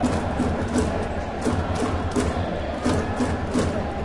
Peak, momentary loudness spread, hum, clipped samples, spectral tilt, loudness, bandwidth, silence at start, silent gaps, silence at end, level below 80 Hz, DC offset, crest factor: -10 dBFS; 3 LU; none; under 0.1%; -6 dB/octave; -25 LUFS; 11.5 kHz; 0 s; none; 0 s; -34 dBFS; under 0.1%; 14 dB